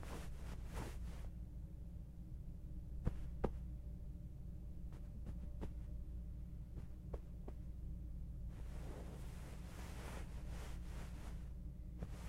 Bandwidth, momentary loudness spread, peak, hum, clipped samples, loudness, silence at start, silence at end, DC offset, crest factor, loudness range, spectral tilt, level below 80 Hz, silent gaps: 15.5 kHz; 6 LU; -24 dBFS; none; under 0.1%; -51 LUFS; 0 s; 0 s; under 0.1%; 24 dB; 2 LU; -7 dB/octave; -50 dBFS; none